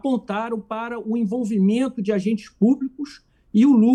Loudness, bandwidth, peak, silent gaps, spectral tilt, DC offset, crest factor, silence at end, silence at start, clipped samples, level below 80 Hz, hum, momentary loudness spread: -22 LUFS; 9.8 kHz; -6 dBFS; none; -8 dB/octave; under 0.1%; 14 dB; 0 s; 0.05 s; under 0.1%; -62 dBFS; none; 11 LU